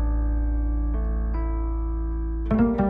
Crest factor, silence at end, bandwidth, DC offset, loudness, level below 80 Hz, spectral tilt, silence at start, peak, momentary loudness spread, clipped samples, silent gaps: 14 dB; 0 s; 2.8 kHz; under 0.1%; -27 LUFS; -24 dBFS; -12 dB/octave; 0 s; -10 dBFS; 6 LU; under 0.1%; none